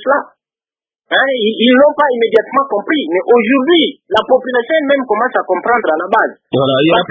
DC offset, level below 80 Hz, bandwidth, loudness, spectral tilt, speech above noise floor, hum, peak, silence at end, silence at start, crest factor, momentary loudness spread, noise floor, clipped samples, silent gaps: under 0.1%; -56 dBFS; 6 kHz; -12 LUFS; -7 dB/octave; over 78 dB; none; 0 dBFS; 0.05 s; 0 s; 12 dB; 5 LU; under -90 dBFS; under 0.1%; none